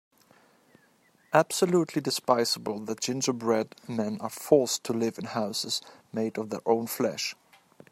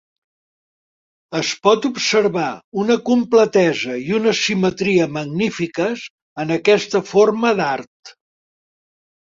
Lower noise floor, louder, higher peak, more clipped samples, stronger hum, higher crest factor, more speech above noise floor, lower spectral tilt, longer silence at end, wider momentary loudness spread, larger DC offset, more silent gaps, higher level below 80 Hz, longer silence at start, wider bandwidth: second, -64 dBFS vs under -90 dBFS; second, -28 LUFS vs -18 LUFS; second, -6 dBFS vs -2 dBFS; neither; neither; first, 24 dB vs 18 dB; second, 36 dB vs over 73 dB; about the same, -4 dB/octave vs -4.5 dB/octave; second, 0.6 s vs 1.1 s; about the same, 9 LU vs 8 LU; neither; second, none vs 2.64-2.72 s, 6.10-6.36 s, 7.87-8.03 s; second, -74 dBFS vs -60 dBFS; about the same, 1.3 s vs 1.3 s; first, 16 kHz vs 7.8 kHz